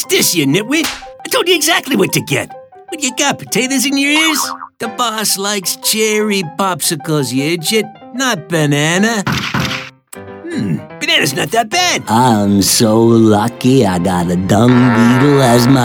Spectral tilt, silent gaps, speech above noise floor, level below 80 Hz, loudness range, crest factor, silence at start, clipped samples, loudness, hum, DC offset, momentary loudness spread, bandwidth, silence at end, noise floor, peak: -4 dB/octave; none; 20 dB; -48 dBFS; 5 LU; 14 dB; 0 s; under 0.1%; -13 LUFS; none; under 0.1%; 10 LU; over 20 kHz; 0 s; -32 dBFS; 0 dBFS